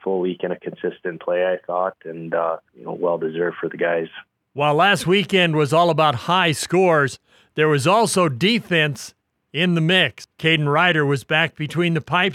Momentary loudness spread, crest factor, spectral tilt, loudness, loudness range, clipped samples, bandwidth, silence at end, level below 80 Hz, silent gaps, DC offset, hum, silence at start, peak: 12 LU; 18 dB; -5 dB/octave; -19 LUFS; 7 LU; under 0.1%; 15 kHz; 0 s; -64 dBFS; none; under 0.1%; none; 0.05 s; -2 dBFS